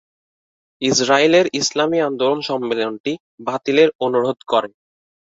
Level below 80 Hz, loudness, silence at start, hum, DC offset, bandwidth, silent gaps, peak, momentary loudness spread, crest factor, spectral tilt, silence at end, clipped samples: -62 dBFS; -18 LUFS; 0.8 s; none; under 0.1%; 8 kHz; 3.00-3.04 s, 3.20-3.38 s, 3.95-3.99 s; -2 dBFS; 12 LU; 18 dB; -3.5 dB/octave; 0.7 s; under 0.1%